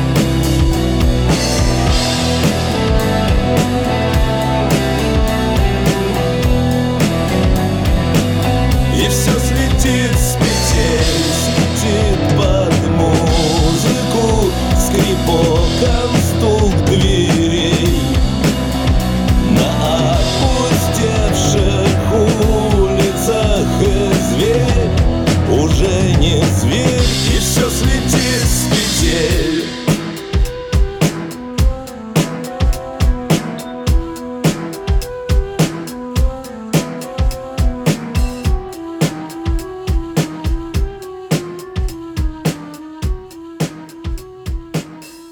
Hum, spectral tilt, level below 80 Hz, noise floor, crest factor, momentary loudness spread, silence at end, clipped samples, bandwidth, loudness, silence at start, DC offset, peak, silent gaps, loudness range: none; -5 dB/octave; -20 dBFS; -34 dBFS; 14 dB; 10 LU; 0 s; under 0.1%; 18.5 kHz; -15 LUFS; 0 s; under 0.1%; 0 dBFS; none; 7 LU